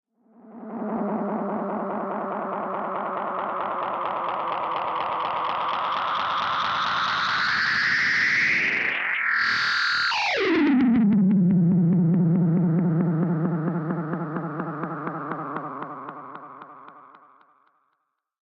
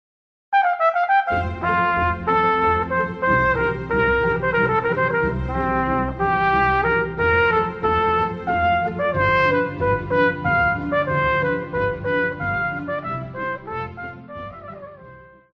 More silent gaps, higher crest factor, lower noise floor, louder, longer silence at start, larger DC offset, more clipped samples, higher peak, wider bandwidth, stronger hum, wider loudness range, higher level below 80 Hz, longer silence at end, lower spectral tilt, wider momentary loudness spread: neither; about the same, 12 dB vs 16 dB; first, -76 dBFS vs -44 dBFS; second, -23 LUFS vs -20 LUFS; about the same, 0.45 s vs 0.5 s; neither; neither; second, -12 dBFS vs -6 dBFS; first, 7.4 kHz vs 6.6 kHz; neither; first, 11 LU vs 5 LU; second, -66 dBFS vs -40 dBFS; first, 1.35 s vs 0.3 s; second, -6.5 dB/octave vs -8 dB/octave; about the same, 12 LU vs 11 LU